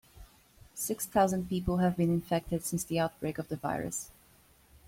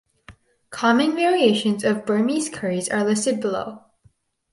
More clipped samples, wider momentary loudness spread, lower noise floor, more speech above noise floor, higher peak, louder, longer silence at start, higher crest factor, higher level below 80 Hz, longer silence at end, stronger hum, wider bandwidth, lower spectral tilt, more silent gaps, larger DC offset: neither; about the same, 9 LU vs 8 LU; about the same, -62 dBFS vs -60 dBFS; second, 31 dB vs 39 dB; second, -14 dBFS vs -4 dBFS; second, -32 LUFS vs -21 LUFS; second, 0.15 s vs 0.3 s; about the same, 18 dB vs 18 dB; first, -54 dBFS vs -62 dBFS; about the same, 0.8 s vs 0.75 s; neither; first, 16.5 kHz vs 11.5 kHz; about the same, -5.5 dB/octave vs -4.5 dB/octave; neither; neither